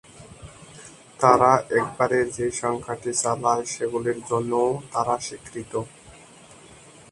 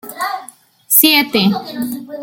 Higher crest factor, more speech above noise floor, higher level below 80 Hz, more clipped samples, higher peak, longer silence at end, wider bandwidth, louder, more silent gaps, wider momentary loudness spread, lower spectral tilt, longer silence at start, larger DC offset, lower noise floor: first, 24 dB vs 16 dB; about the same, 25 dB vs 25 dB; about the same, -56 dBFS vs -60 dBFS; neither; about the same, 0 dBFS vs 0 dBFS; first, 0.4 s vs 0 s; second, 11.5 kHz vs over 20 kHz; second, -23 LUFS vs -13 LUFS; neither; first, 25 LU vs 15 LU; first, -4.5 dB/octave vs -2.5 dB/octave; about the same, 0.15 s vs 0.05 s; neither; first, -48 dBFS vs -40 dBFS